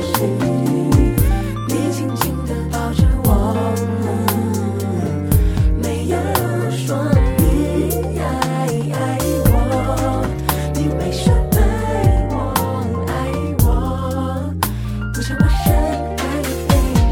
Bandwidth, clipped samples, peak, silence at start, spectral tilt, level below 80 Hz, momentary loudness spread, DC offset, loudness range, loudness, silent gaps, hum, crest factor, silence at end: 17.5 kHz; under 0.1%; 0 dBFS; 0 s; -6.5 dB/octave; -22 dBFS; 6 LU; under 0.1%; 1 LU; -18 LUFS; none; none; 16 dB; 0 s